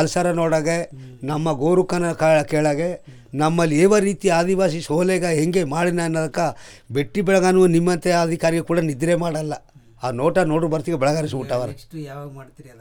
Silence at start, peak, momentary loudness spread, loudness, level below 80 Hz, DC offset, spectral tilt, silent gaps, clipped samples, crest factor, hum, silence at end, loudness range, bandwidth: 0 s; -4 dBFS; 15 LU; -20 LUFS; -48 dBFS; under 0.1%; -6 dB/octave; none; under 0.1%; 16 dB; none; 0.1 s; 3 LU; 18 kHz